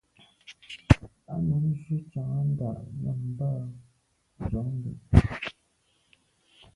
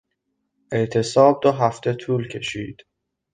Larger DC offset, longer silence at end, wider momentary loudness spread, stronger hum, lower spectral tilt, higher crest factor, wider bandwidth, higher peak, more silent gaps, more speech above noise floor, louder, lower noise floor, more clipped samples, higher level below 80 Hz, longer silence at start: neither; first, 1.25 s vs 0.6 s; first, 16 LU vs 13 LU; neither; first, -8 dB/octave vs -6 dB/octave; first, 28 dB vs 20 dB; first, 11 kHz vs 9.6 kHz; about the same, 0 dBFS vs -2 dBFS; neither; second, 42 dB vs 55 dB; second, -29 LUFS vs -20 LUFS; second, -70 dBFS vs -75 dBFS; neither; first, -38 dBFS vs -58 dBFS; second, 0.5 s vs 0.7 s